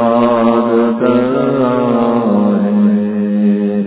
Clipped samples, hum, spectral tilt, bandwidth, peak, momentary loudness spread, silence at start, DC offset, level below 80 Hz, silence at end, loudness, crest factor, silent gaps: under 0.1%; none; -12 dB/octave; 4 kHz; 0 dBFS; 2 LU; 0 s; under 0.1%; -54 dBFS; 0 s; -12 LUFS; 12 dB; none